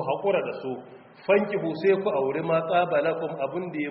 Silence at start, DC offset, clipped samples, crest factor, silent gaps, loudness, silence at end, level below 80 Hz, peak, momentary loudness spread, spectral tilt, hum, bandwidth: 0 s; under 0.1%; under 0.1%; 18 dB; none; -26 LUFS; 0 s; -70 dBFS; -8 dBFS; 10 LU; -4.5 dB/octave; none; 5.6 kHz